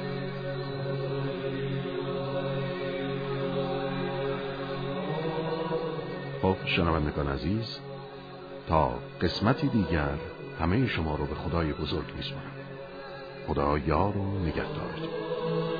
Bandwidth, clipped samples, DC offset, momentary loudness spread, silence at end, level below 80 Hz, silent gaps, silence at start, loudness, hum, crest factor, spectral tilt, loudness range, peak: 5 kHz; under 0.1%; under 0.1%; 13 LU; 0 s; -44 dBFS; none; 0 s; -31 LUFS; none; 22 dB; -8.5 dB/octave; 3 LU; -8 dBFS